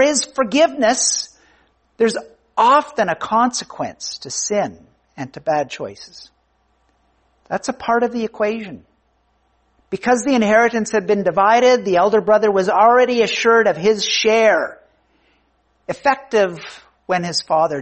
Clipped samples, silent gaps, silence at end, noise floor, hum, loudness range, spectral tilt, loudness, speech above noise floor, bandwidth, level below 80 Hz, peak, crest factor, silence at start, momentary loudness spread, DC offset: under 0.1%; none; 0 s; -62 dBFS; none; 10 LU; -3 dB/octave; -17 LUFS; 46 dB; 8.8 kHz; -58 dBFS; -2 dBFS; 16 dB; 0 s; 15 LU; under 0.1%